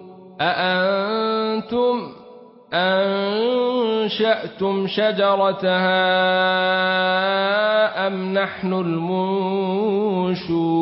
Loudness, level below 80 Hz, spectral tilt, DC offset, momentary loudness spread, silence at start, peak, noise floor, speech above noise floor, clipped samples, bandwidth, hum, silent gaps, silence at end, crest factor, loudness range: -20 LUFS; -62 dBFS; -10 dB/octave; under 0.1%; 5 LU; 0 s; -6 dBFS; -44 dBFS; 24 dB; under 0.1%; 5.8 kHz; none; none; 0 s; 14 dB; 3 LU